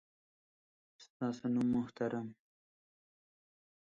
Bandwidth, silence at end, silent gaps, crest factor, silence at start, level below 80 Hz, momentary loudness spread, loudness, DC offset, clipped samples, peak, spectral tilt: 7.4 kHz; 1.45 s; 1.10-1.20 s; 18 dB; 1 s; -74 dBFS; 9 LU; -37 LUFS; under 0.1%; under 0.1%; -22 dBFS; -7.5 dB/octave